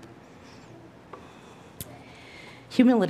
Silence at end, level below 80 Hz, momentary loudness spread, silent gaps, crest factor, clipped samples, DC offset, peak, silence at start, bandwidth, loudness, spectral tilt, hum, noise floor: 0 s; -64 dBFS; 24 LU; none; 22 dB; under 0.1%; under 0.1%; -6 dBFS; 1.8 s; 15.5 kHz; -27 LUFS; -6 dB/octave; none; -49 dBFS